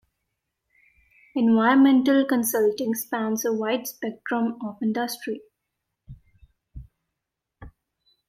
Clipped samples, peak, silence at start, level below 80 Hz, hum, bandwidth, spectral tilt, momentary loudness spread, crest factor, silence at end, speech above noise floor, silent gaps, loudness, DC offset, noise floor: under 0.1%; -8 dBFS; 1.35 s; -56 dBFS; none; 16.5 kHz; -4.5 dB/octave; 15 LU; 18 dB; 0.6 s; 62 dB; none; -23 LUFS; under 0.1%; -84 dBFS